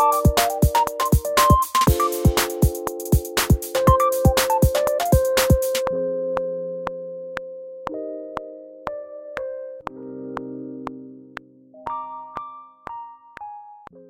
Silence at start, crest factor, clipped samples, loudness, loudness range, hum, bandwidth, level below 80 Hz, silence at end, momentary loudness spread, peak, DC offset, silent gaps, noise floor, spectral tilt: 0 s; 20 dB; under 0.1%; -21 LUFS; 15 LU; none; 17 kHz; -30 dBFS; 0.05 s; 20 LU; -2 dBFS; under 0.1%; none; -44 dBFS; -5 dB/octave